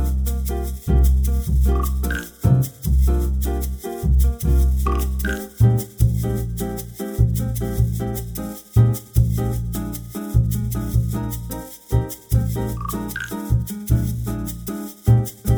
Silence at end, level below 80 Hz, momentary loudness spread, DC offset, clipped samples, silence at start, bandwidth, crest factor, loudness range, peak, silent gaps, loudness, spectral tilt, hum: 0 s; -22 dBFS; 10 LU; under 0.1%; under 0.1%; 0 s; over 20 kHz; 16 dB; 4 LU; -2 dBFS; none; -22 LUFS; -7 dB/octave; none